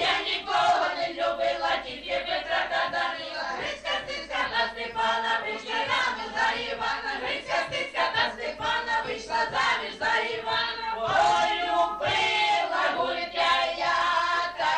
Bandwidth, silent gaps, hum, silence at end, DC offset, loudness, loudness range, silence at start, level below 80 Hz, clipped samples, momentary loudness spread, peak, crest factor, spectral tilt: 10 kHz; none; none; 0 s; under 0.1%; -26 LUFS; 4 LU; 0 s; -56 dBFS; under 0.1%; 6 LU; -12 dBFS; 14 dB; -2 dB/octave